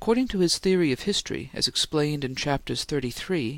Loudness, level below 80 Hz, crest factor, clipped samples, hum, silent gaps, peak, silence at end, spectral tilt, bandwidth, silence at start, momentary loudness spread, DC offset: -25 LUFS; -48 dBFS; 16 dB; under 0.1%; none; none; -8 dBFS; 0 s; -4 dB/octave; 17 kHz; 0 s; 6 LU; under 0.1%